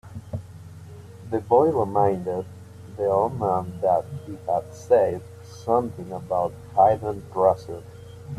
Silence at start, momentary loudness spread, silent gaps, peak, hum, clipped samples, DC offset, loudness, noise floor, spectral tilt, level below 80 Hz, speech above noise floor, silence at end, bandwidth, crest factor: 0.05 s; 23 LU; none; -6 dBFS; none; under 0.1%; under 0.1%; -23 LUFS; -42 dBFS; -8 dB/octave; -58 dBFS; 19 dB; 0 s; 13.5 kHz; 18 dB